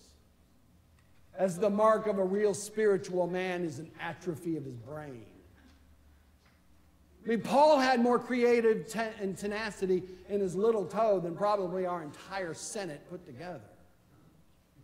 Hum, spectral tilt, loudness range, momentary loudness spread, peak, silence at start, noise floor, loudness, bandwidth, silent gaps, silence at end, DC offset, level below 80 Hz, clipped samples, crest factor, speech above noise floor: none; -5.5 dB/octave; 12 LU; 18 LU; -14 dBFS; 1.35 s; -63 dBFS; -30 LUFS; 16 kHz; none; 1.15 s; under 0.1%; -66 dBFS; under 0.1%; 18 dB; 33 dB